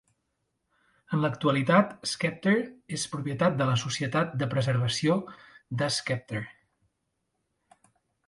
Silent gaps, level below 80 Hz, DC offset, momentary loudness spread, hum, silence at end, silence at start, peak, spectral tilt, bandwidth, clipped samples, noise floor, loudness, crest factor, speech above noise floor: none; -66 dBFS; under 0.1%; 11 LU; none; 1.75 s; 1.1 s; -8 dBFS; -5 dB/octave; 11.5 kHz; under 0.1%; -79 dBFS; -28 LUFS; 22 dB; 52 dB